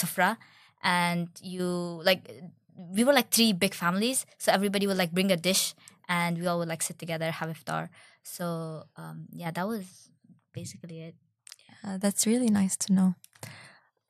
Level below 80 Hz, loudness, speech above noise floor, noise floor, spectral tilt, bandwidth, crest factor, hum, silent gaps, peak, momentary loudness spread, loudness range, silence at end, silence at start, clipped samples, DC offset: -74 dBFS; -28 LUFS; 27 dB; -56 dBFS; -4 dB/octave; 16 kHz; 24 dB; none; none; -6 dBFS; 20 LU; 12 LU; 0.4 s; 0 s; under 0.1%; under 0.1%